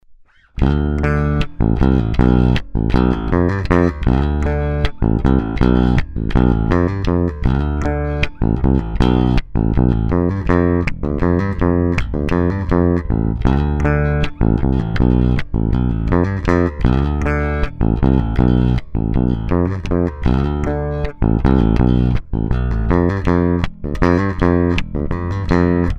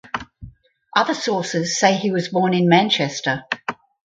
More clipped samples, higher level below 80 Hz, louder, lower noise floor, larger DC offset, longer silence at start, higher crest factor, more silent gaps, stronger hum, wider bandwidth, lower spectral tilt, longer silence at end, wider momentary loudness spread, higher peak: neither; first, -22 dBFS vs -54 dBFS; about the same, -17 LUFS vs -19 LUFS; about the same, -45 dBFS vs -44 dBFS; neither; about the same, 0.1 s vs 0.05 s; about the same, 16 dB vs 20 dB; neither; neither; second, 7.4 kHz vs 9.2 kHz; first, -9 dB/octave vs -4.5 dB/octave; second, 0 s vs 0.35 s; second, 5 LU vs 11 LU; about the same, 0 dBFS vs 0 dBFS